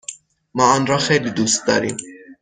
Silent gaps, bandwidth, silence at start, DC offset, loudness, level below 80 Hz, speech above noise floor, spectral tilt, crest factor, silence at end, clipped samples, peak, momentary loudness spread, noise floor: none; 10 kHz; 0.1 s; under 0.1%; -17 LUFS; -56 dBFS; 21 dB; -3.5 dB/octave; 18 dB; 0.1 s; under 0.1%; 0 dBFS; 14 LU; -38 dBFS